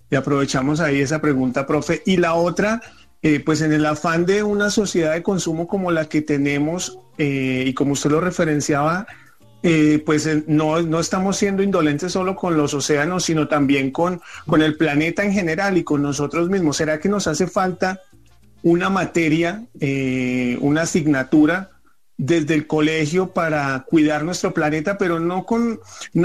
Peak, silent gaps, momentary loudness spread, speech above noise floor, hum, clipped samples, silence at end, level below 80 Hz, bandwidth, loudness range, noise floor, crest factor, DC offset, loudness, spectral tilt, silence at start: -6 dBFS; none; 5 LU; 34 dB; none; under 0.1%; 0 s; -50 dBFS; 13.5 kHz; 2 LU; -52 dBFS; 12 dB; 0.3%; -19 LUFS; -5.5 dB/octave; 0.1 s